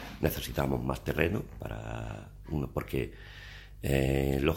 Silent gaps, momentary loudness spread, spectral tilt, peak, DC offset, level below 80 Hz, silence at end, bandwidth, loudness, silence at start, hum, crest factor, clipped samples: none; 16 LU; -6.5 dB/octave; -8 dBFS; under 0.1%; -42 dBFS; 0 s; 17 kHz; -33 LUFS; 0 s; none; 24 dB; under 0.1%